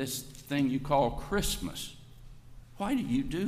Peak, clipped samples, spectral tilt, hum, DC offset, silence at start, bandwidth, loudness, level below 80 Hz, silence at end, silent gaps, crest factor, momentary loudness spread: -14 dBFS; under 0.1%; -5 dB/octave; none; under 0.1%; 0 s; 15.5 kHz; -32 LUFS; -44 dBFS; 0 s; none; 18 dB; 10 LU